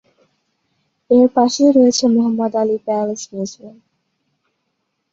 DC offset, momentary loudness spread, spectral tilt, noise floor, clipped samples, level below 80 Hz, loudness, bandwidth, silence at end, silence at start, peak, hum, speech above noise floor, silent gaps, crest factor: under 0.1%; 14 LU; -5 dB/octave; -72 dBFS; under 0.1%; -62 dBFS; -15 LUFS; 7.8 kHz; 1.45 s; 1.1 s; -2 dBFS; none; 57 dB; none; 16 dB